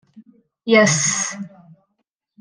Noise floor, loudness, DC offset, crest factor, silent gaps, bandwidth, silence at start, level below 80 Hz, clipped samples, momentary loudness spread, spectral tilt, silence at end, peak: -74 dBFS; -16 LUFS; under 0.1%; 20 dB; none; 10.5 kHz; 0.15 s; -68 dBFS; under 0.1%; 20 LU; -3 dB/octave; 0.9 s; -2 dBFS